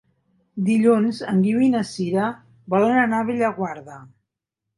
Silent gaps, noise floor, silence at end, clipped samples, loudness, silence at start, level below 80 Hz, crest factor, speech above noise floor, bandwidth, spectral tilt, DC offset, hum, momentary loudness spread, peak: none; -83 dBFS; 0.75 s; under 0.1%; -20 LUFS; 0.55 s; -62 dBFS; 16 dB; 63 dB; 11.5 kHz; -7 dB/octave; under 0.1%; none; 12 LU; -6 dBFS